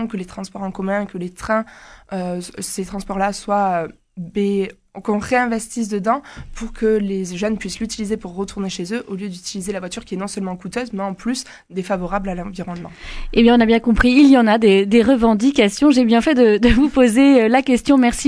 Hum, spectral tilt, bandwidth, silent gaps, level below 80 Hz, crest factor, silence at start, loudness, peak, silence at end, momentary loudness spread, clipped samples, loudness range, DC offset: none; -5 dB/octave; 11 kHz; none; -36 dBFS; 16 dB; 0 s; -17 LUFS; -2 dBFS; 0 s; 16 LU; under 0.1%; 12 LU; under 0.1%